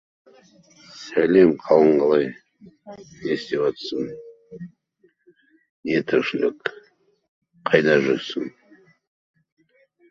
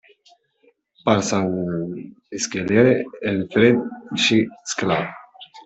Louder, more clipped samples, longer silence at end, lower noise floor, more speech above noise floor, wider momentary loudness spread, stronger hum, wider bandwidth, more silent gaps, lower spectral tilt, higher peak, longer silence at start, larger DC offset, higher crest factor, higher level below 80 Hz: about the same, -21 LUFS vs -20 LUFS; neither; first, 1.6 s vs 0.05 s; about the same, -63 dBFS vs -61 dBFS; about the same, 42 dB vs 41 dB; first, 24 LU vs 14 LU; neither; second, 7.4 kHz vs 8.4 kHz; first, 5.69-5.83 s, 7.28-7.42 s vs none; first, -6.5 dB/octave vs -4.5 dB/octave; about the same, -2 dBFS vs -2 dBFS; about the same, 0.95 s vs 1.05 s; neither; about the same, 22 dB vs 18 dB; second, -64 dBFS vs -58 dBFS